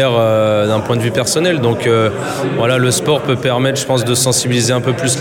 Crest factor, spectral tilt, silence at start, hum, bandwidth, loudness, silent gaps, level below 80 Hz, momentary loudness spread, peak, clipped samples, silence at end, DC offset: 12 dB; -4.5 dB/octave; 0 s; none; 17.5 kHz; -14 LUFS; none; -48 dBFS; 3 LU; -2 dBFS; under 0.1%; 0 s; under 0.1%